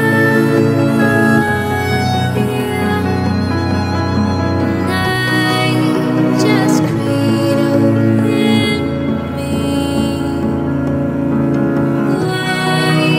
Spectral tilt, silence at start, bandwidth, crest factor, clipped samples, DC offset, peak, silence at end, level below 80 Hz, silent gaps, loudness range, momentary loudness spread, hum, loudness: -6.5 dB/octave; 0 s; 16 kHz; 12 dB; under 0.1%; under 0.1%; 0 dBFS; 0 s; -40 dBFS; none; 3 LU; 5 LU; none; -14 LUFS